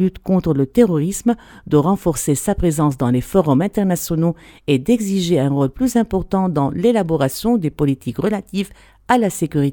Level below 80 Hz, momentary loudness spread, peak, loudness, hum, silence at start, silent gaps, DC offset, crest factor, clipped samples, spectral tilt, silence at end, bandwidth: -38 dBFS; 5 LU; 0 dBFS; -18 LUFS; none; 0 s; none; under 0.1%; 16 dB; under 0.1%; -6.5 dB/octave; 0 s; 19 kHz